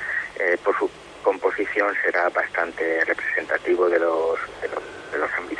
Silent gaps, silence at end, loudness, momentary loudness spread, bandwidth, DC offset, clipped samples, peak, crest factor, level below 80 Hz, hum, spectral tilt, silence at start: none; 0 s; -23 LUFS; 8 LU; 10.5 kHz; under 0.1%; under 0.1%; -6 dBFS; 18 dB; -60 dBFS; none; -4.5 dB/octave; 0 s